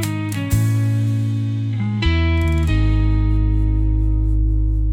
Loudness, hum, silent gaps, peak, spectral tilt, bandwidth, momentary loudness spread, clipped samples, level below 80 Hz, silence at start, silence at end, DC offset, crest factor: -19 LUFS; none; none; -4 dBFS; -7 dB/octave; 16.5 kHz; 4 LU; under 0.1%; -20 dBFS; 0 s; 0 s; under 0.1%; 12 dB